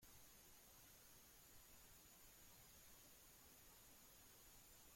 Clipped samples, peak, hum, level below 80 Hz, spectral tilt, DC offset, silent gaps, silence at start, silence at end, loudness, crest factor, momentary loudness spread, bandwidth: under 0.1%; -54 dBFS; none; -78 dBFS; -2 dB/octave; under 0.1%; none; 0 s; 0 s; -65 LUFS; 14 dB; 1 LU; 16.5 kHz